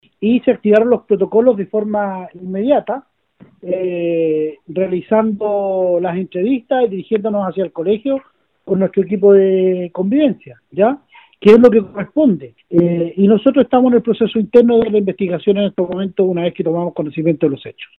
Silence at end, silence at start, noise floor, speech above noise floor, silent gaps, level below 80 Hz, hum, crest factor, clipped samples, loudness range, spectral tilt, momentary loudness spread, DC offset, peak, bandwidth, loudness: 0.15 s; 0.2 s; -48 dBFS; 33 dB; none; -54 dBFS; none; 14 dB; 0.2%; 5 LU; -9.5 dB/octave; 10 LU; under 0.1%; 0 dBFS; 5.6 kHz; -15 LUFS